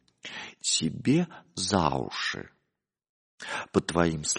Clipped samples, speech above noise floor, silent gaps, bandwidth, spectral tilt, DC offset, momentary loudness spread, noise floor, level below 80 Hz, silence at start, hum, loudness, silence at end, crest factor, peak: under 0.1%; 55 dB; 3.09-3.38 s; 10.5 kHz; -4 dB/octave; under 0.1%; 14 LU; -83 dBFS; -54 dBFS; 0.25 s; none; -28 LUFS; 0 s; 24 dB; -6 dBFS